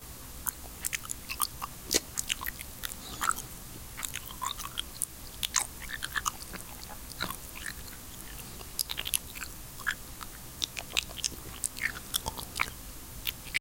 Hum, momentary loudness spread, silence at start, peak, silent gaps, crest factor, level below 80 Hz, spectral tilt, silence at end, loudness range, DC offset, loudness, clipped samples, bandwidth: none; 12 LU; 0 s; -6 dBFS; none; 32 dB; -50 dBFS; -1 dB/octave; 0 s; 3 LU; under 0.1%; -35 LUFS; under 0.1%; 17 kHz